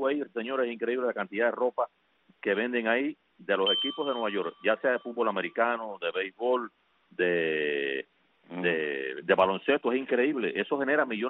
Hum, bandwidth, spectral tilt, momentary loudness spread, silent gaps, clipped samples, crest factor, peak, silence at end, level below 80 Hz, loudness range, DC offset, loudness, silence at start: none; 4.1 kHz; -7.5 dB/octave; 8 LU; none; under 0.1%; 18 dB; -10 dBFS; 0 s; -76 dBFS; 2 LU; under 0.1%; -29 LUFS; 0 s